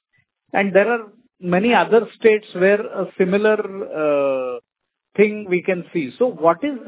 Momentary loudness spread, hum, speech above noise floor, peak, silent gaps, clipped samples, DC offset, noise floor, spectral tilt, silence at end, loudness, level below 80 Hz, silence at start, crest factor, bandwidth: 10 LU; none; 61 dB; 0 dBFS; none; under 0.1%; under 0.1%; -79 dBFS; -10 dB/octave; 0 s; -19 LUFS; -66 dBFS; 0.55 s; 18 dB; 4 kHz